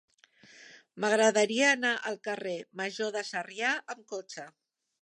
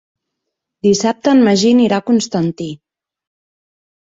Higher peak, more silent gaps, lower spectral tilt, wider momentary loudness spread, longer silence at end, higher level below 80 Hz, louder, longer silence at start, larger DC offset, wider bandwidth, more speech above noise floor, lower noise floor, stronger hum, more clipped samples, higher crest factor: second, -12 dBFS vs -2 dBFS; neither; second, -2.5 dB/octave vs -5 dB/octave; first, 16 LU vs 10 LU; second, 0.55 s vs 1.4 s; second, -88 dBFS vs -58 dBFS; second, -29 LUFS vs -14 LUFS; second, 0.6 s vs 0.85 s; neither; first, 11.5 kHz vs 8 kHz; second, 29 dB vs 65 dB; second, -59 dBFS vs -78 dBFS; neither; neither; first, 20 dB vs 14 dB